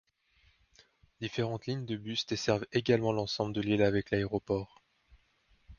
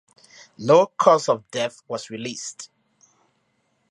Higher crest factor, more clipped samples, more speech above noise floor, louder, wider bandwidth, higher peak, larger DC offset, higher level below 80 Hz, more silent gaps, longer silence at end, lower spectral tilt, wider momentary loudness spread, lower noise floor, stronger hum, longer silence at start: about the same, 22 dB vs 22 dB; neither; second, 38 dB vs 48 dB; second, -32 LUFS vs -21 LUFS; second, 7.2 kHz vs 11.5 kHz; second, -12 dBFS vs -2 dBFS; neither; first, -58 dBFS vs -74 dBFS; neither; second, 0.05 s vs 1.25 s; first, -6 dB/octave vs -4.5 dB/octave; second, 8 LU vs 17 LU; about the same, -69 dBFS vs -69 dBFS; neither; first, 1.2 s vs 0.6 s